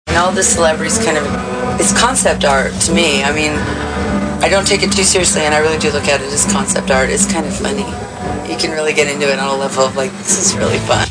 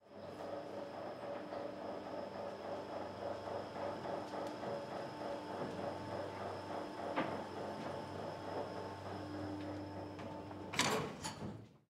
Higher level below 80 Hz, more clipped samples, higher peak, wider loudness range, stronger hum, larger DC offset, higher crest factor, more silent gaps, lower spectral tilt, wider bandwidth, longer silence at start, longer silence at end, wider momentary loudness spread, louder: first, -32 dBFS vs -74 dBFS; neither; first, 0 dBFS vs -18 dBFS; about the same, 3 LU vs 3 LU; neither; neither; second, 14 dB vs 26 dB; neither; second, -3 dB/octave vs -4.5 dB/octave; second, 10.5 kHz vs 15.5 kHz; about the same, 0.05 s vs 0 s; about the same, 0 s vs 0.1 s; about the same, 8 LU vs 7 LU; first, -13 LUFS vs -44 LUFS